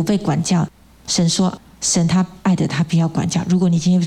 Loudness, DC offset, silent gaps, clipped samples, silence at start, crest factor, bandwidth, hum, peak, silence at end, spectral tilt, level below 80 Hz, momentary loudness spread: -18 LUFS; under 0.1%; none; under 0.1%; 0 s; 12 dB; 12 kHz; none; -4 dBFS; 0 s; -5 dB/octave; -48 dBFS; 6 LU